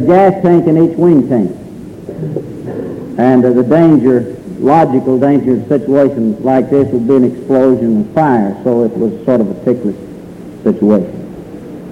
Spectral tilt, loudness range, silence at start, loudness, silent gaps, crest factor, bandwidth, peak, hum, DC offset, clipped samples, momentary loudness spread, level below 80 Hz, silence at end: -9.5 dB/octave; 3 LU; 0 s; -11 LUFS; none; 12 dB; 10 kHz; 0 dBFS; none; under 0.1%; under 0.1%; 19 LU; -46 dBFS; 0 s